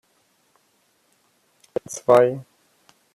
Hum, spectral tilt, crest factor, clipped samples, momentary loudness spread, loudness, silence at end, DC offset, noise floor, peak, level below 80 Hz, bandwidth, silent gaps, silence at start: none; -5.5 dB/octave; 22 dB; under 0.1%; 17 LU; -20 LUFS; 0.75 s; under 0.1%; -65 dBFS; -4 dBFS; -70 dBFS; 14 kHz; none; 1.9 s